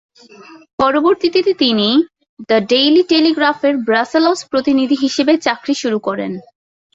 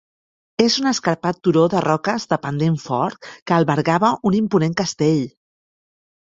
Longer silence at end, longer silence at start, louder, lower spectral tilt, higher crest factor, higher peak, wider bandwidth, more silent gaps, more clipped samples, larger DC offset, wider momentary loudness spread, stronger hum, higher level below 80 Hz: second, 0.55 s vs 0.9 s; about the same, 0.5 s vs 0.6 s; first, -14 LUFS vs -19 LUFS; second, -4 dB/octave vs -5.5 dB/octave; second, 14 dB vs 20 dB; about the same, -2 dBFS vs 0 dBFS; about the same, 8 kHz vs 7.8 kHz; first, 0.73-0.78 s, 2.29-2.37 s vs 3.42-3.46 s; neither; neither; about the same, 8 LU vs 6 LU; neither; about the same, -56 dBFS vs -58 dBFS